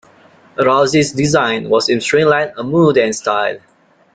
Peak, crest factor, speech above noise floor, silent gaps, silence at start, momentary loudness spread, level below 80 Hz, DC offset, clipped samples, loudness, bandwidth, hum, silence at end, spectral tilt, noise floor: 0 dBFS; 14 dB; 33 dB; none; 0.6 s; 6 LU; -52 dBFS; under 0.1%; under 0.1%; -14 LUFS; 9.4 kHz; none; 0.55 s; -4.5 dB/octave; -46 dBFS